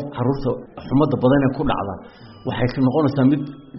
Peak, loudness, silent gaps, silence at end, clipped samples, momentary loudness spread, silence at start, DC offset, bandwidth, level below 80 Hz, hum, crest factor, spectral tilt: -4 dBFS; -20 LUFS; none; 0 s; under 0.1%; 13 LU; 0 s; under 0.1%; 5.8 kHz; -40 dBFS; none; 16 dB; -7 dB/octave